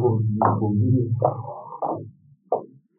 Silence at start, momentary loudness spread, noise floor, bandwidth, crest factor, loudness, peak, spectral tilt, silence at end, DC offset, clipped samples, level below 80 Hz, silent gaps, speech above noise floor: 0 s; 13 LU; -46 dBFS; 2 kHz; 20 dB; -24 LUFS; -4 dBFS; -14 dB/octave; 0.35 s; under 0.1%; under 0.1%; -66 dBFS; none; 25 dB